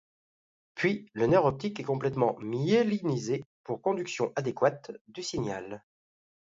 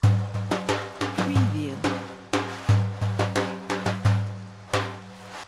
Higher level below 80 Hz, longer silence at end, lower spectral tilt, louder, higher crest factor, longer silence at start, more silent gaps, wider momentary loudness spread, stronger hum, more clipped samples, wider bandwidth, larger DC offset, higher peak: second, -64 dBFS vs -50 dBFS; first, 0.7 s vs 0 s; about the same, -6 dB/octave vs -6 dB/octave; second, -30 LUFS vs -26 LUFS; about the same, 20 dB vs 22 dB; first, 0.75 s vs 0 s; first, 3.46-3.64 s, 5.01-5.05 s vs none; first, 14 LU vs 10 LU; neither; neither; second, 7.8 kHz vs 12 kHz; neither; second, -10 dBFS vs -4 dBFS